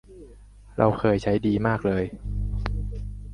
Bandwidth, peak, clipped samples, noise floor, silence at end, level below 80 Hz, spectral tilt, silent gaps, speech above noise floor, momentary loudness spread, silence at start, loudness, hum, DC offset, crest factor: 11 kHz; -4 dBFS; under 0.1%; -47 dBFS; 0 s; -34 dBFS; -8.5 dB/octave; none; 24 dB; 11 LU; 0.1 s; -25 LUFS; none; under 0.1%; 22 dB